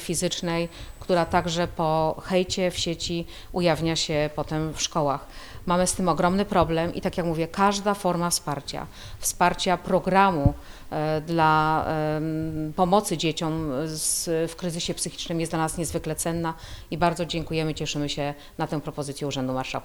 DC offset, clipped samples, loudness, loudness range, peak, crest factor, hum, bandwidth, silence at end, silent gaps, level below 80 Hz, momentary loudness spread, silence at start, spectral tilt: under 0.1%; under 0.1%; -25 LUFS; 4 LU; -6 dBFS; 20 dB; none; over 20 kHz; 0 s; none; -42 dBFS; 9 LU; 0 s; -4.5 dB/octave